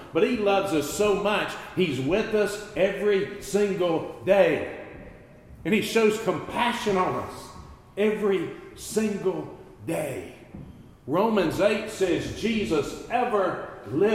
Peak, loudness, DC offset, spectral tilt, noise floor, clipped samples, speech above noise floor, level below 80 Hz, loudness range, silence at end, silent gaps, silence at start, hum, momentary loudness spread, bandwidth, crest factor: -8 dBFS; -25 LUFS; under 0.1%; -5 dB/octave; -47 dBFS; under 0.1%; 23 dB; -52 dBFS; 5 LU; 0 s; none; 0 s; none; 16 LU; 15.5 kHz; 18 dB